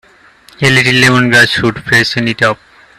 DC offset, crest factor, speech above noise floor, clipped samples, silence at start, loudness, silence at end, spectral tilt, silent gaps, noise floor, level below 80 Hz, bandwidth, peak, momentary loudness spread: under 0.1%; 12 dB; 33 dB; 0.2%; 0.6 s; -9 LUFS; 0.45 s; -4 dB/octave; none; -43 dBFS; -44 dBFS; 14.5 kHz; 0 dBFS; 7 LU